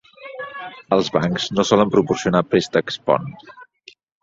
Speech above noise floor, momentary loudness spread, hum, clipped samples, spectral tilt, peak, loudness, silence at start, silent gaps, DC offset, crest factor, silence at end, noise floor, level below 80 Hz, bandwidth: 31 dB; 17 LU; none; under 0.1%; -5.5 dB/octave; -2 dBFS; -19 LUFS; 0.2 s; none; under 0.1%; 18 dB; 0.6 s; -50 dBFS; -54 dBFS; 7.8 kHz